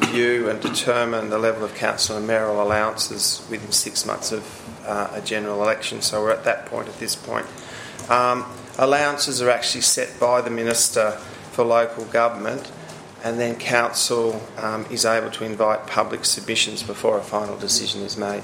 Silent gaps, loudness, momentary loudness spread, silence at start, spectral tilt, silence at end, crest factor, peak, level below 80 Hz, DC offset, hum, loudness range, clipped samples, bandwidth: none; -21 LUFS; 10 LU; 0 s; -2 dB/octave; 0 s; 22 dB; 0 dBFS; -60 dBFS; under 0.1%; none; 4 LU; under 0.1%; 16.5 kHz